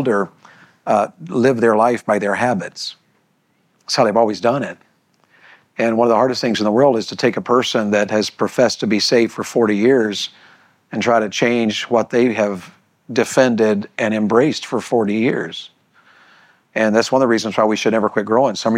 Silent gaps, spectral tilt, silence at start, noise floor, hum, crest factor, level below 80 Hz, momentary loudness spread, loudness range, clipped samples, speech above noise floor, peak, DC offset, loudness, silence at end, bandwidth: none; -5 dB/octave; 0 s; -62 dBFS; none; 16 dB; -68 dBFS; 9 LU; 3 LU; under 0.1%; 46 dB; -2 dBFS; under 0.1%; -17 LUFS; 0 s; 15 kHz